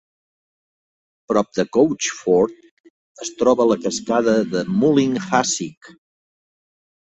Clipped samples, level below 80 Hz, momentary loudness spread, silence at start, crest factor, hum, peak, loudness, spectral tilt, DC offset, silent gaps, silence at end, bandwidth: under 0.1%; -58 dBFS; 7 LU; 1.3 s; 18 dB; none; -2 dBFS; -19 LUFS; -4.5 dB/octave; under 0.1%; 2.71-2.84 s, 2.90-3.15 s, 5.77-5.81 s; 1.15 s; 8.2 kHz